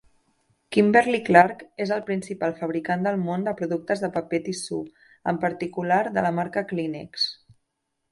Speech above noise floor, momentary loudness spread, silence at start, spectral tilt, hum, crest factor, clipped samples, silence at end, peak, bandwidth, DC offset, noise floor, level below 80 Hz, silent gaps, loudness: 54 dB; 12 LU; 0.7 s; -5.5 dB/octave; none; 24 dB; under 0.1%; 0.8 s; 0 dBFS; 11.5 kHz; under 0.1%; -78 dBFS; -64 dBFS; none; -24 LUFS